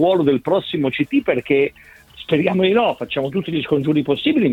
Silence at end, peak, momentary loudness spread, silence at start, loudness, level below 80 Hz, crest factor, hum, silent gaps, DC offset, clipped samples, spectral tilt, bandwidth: 0 s; -2 dBFS; 6 LU; 0 s; -18 LUFS; -54 dBFS; 16 dB; none; none; under 0.1%; under 0.1%; -8 dB/octave; 5.4 kHz